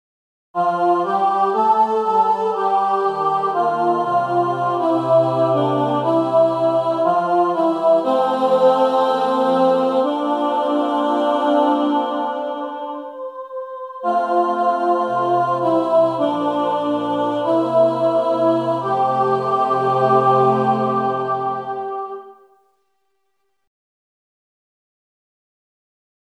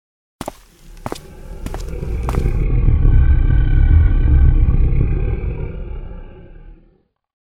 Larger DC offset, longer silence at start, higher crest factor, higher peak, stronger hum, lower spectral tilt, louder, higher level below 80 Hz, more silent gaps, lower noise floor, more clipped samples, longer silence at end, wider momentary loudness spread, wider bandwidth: neither; first, 0.55 s vs 0.4 s; about the same, 16 dB vs 14 dB; second, -4 dBFS vs 0 dBFS; neither; about the same, -7.5 dB/octave vs -8.5 dB/octave; about the same, -18 LUFS vs -17 LUFS; second, -74 dBFS vs -16 dBFS; neither; first, -73 dBFS vs -56 dBFS; neither; first, 3.9 s vs 0.65 s; second, 9 LU vs 18 LU; about the same, 10 kHz vs 9.2 kHz